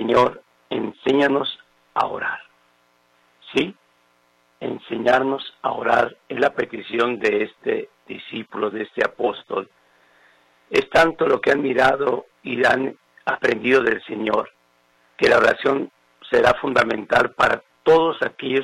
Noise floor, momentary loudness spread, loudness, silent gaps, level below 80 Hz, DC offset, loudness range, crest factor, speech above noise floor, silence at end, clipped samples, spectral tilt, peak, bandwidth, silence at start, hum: -61 dBFS; 12 LU; -20 LUFS; none; -56 dBFS; under 0.1%; 7 LU; 18 dB; 42 dB; 0 s; under 0.1%; -5 dB/octave; -4 dBFS; 12.5 kHz; 0 s; none